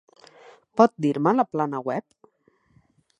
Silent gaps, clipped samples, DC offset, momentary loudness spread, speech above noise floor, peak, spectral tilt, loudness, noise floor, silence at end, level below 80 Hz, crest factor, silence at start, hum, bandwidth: none; under 0.1%; under 0.1%; 12 LU; 42 dB; -2 dBFS; -7.5 dB/octave; -23 LUFS; -64 dBFS; 1.2 s; -74 dBFS; 24 dB; 0.75 s; none; 10 kHz